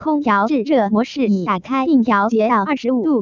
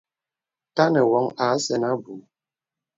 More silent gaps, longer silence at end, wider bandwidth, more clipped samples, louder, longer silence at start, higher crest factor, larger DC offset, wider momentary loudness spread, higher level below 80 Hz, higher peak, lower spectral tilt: neither; second, 0 s vs 0.8 s; about the same, 7.2 kHz vs 7.8 kHz; neither; first, -17 LUFS vs -22 LUFS; second, 0 s vs 0.75 s; second, 12 dB vs 20 dB; neither; second, 4 LU vs 15 LU; first, -56 dBFS vs -72 dBFS; about the same, -4 dBFS vs -4 dBFS; first, -7 dB/octave vs -5 dB/octave